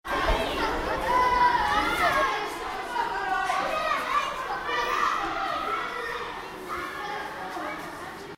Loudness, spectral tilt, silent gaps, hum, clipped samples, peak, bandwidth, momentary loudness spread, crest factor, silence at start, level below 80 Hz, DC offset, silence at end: -27 LUFS; -3.5 dB/octave; none; none; under 0.1%; -12 dBFS; 16 kHz; 11 LU; 16 dB; 0.05 s; -42 dBFS; under 0.1%; 0 s